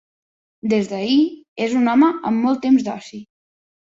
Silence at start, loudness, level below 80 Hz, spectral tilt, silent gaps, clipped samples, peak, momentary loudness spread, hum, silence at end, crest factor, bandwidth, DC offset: 0.65 s; -18 LUFS; -64 dBFS; -6 dB/octave; 1.48-1.56 s; under 0.1%; -4 dBFS; 14 LU; none; 0.75 s; 14 dB; 7.8 kHz; under 0.1%